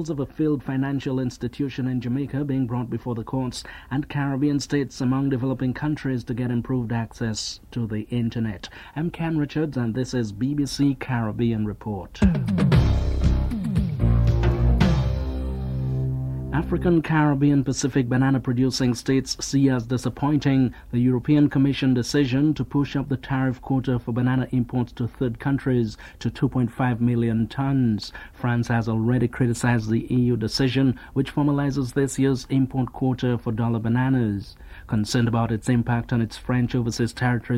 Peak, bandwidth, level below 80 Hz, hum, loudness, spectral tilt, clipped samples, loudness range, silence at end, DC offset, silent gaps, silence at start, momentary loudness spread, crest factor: -6 dBFS; 13 kHz; -34 dBFS; none; -24 LUFS; -6.5 dB/octave; under 0.1%; 5 LU; 0 s; under 0.1%; none; 0 s; 8 LU; 16 dB